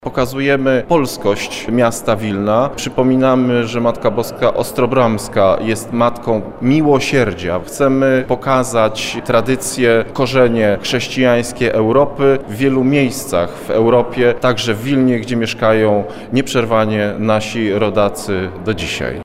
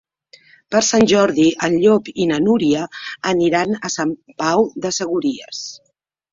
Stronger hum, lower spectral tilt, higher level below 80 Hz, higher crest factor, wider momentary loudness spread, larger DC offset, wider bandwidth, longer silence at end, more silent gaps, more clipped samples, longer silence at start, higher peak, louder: neither; first, -5.5 dB/octave vs -4 dB/octave; first, -40 dBFS vs -54 dBFS; about the same, 12 dB vs 16 dB; second, 6 LU vs 11 LU; neither; first, 16 kHz vs 7.8 kHz; second, 0 s vs 0.55 s; neither; neither; second, 0.05 s vs 0.7 s; about the same, -2 dBFS vs -2 dBFS; about the same, -15 LUFS vs -17 LUFS